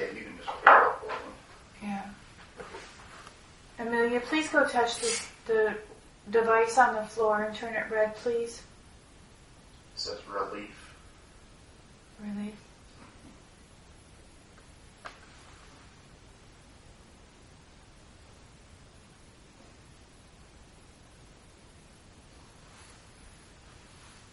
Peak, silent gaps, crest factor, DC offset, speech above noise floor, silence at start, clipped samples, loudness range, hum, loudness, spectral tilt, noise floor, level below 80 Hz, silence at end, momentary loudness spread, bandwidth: 0 dBFS; none; 32 dB; under 0.1%; 27 dB; 0 s; under 0.1%; 25 LU; none; -28 LUFS; -3 dB/octave; -55 dBFS; -60 dBFS; 1.05 s; 28 LU; 11.5 kHz